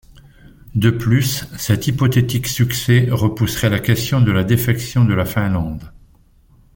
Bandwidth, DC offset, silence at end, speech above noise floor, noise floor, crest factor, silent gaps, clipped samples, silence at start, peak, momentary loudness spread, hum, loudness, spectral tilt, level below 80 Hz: 17 kHz; under 0.1%; 0.85 s; 34 dB; -50 dBFS; 16 dB; none; under 0.1%; 0.75 s; -2 dBFS; 6 LU; none; -17 LUFS; -5.5 dB/octave; -40 dBFS